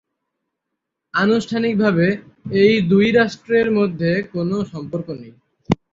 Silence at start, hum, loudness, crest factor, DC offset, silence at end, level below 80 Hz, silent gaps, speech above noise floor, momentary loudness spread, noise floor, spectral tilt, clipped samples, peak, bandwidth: 1.15 s; none; -18 LUFS; 18 dB; under 0.1%; 0.2 s; -52 dBFS; none; 62 dB; 13 LU; -79 dBFS; -7 dB/octave; under 0.1%; -2 dBFS; 7.8 kHz